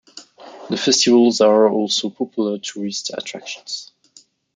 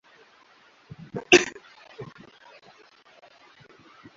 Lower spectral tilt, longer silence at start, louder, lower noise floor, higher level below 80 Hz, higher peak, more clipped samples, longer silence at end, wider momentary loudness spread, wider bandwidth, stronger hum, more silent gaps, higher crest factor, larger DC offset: first, -3 dB/octave vs -1.5 dB/octave; second, 0.15 s vs 1.15 s; about the same, -18 LUFS vs -20 LUFS; second, -52 dBFS vs -57 dBFS; second, -70 dBFS vs -64 dBFS; about the same, -2 dBFS vs 0 dBFS; neither; second, 0.7 s vs 2.15 s; second, 16 LU vs 28 LU; first, 9.6 kHz vs 7.4 kHz; neither; neither; second, 16 dB vs 30 dB; neither